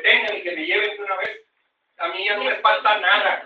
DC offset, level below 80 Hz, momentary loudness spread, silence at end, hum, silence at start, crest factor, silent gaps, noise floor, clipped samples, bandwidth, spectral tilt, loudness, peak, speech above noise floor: under 0.1%; -74 dBFS; 11 LU; 0 s; none; 0 s; 20 dB; none; -71 dBFS; under 0.1%; 7.4 kHz; -2.5 dB/octave; -20 LUFS; -2 dBFS; 50 dB